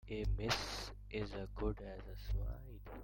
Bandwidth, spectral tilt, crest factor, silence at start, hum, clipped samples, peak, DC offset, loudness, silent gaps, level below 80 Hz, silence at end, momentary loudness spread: 16.5 kHz; -4.5 dB/octave; 20 dB; 0.05 s; 50 Hz at -50 dBFS; under 0.1%; -22 dBFS; under 0.1%; -43 LUFS; none; -46 dBFS; 0 s; 12 LU